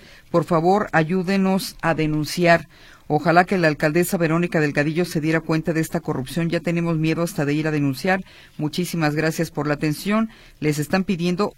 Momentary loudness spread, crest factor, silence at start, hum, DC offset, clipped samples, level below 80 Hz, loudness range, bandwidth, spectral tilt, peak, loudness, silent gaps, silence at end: 7 LU; 20 dB; 0.35 s; none; under 0.1%; under 0.1%; -48 dBFS; 3 LU; 16.5 kHz; -6 dB/octave; -2 dBFS; -21 LUFS; none; 0.05 s